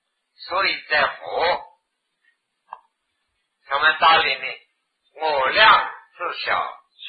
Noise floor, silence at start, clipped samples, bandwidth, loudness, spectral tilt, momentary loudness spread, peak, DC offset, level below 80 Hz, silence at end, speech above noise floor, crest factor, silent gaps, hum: -74 dBFS; 0.4 s; under 0.1%; 5 kHz; -19 LUFS; -5 dB/octave; 17 LU; -2 dBFS; under 0.1%; -58 dBFS; 0 s; 55 dB; 20 dB; none; none